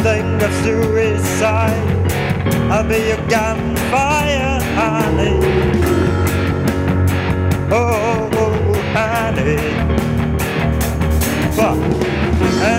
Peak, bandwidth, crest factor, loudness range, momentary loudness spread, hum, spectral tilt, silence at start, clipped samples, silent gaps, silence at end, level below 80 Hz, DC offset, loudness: -2 dBFS; 16.5 kHz; 12 dB; 1 LU; 2 LU; none; -6 dB/octave; 0 s; under 0.1%; none; 0 s; -26 dBFS; under 0.1%; -16 LUFS